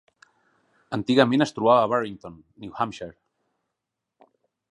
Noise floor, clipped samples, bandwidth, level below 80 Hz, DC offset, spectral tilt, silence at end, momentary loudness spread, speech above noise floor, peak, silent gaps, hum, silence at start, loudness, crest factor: -84 dBFS; under 0.1%; 11 kHz; -64 dBFS; under 0.1%; -6 dB/octave; 1.6 s; 22 LU; 61 dB; -2 dBFS; none; none; 0.9 s; -22 LUFS; 24 dB